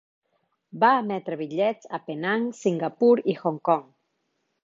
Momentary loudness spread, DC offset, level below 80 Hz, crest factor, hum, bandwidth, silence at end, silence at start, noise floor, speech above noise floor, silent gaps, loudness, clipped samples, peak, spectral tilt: 10 LU; under 0.1%; -78 dBFS; 20 dB; none; 7.6 kHz; 0.8 s; 0.75 s; -75 dBFS; 51 dB; none; -24 LUFS; under 0.1%; -6 dBFS; -6.5 dB/octave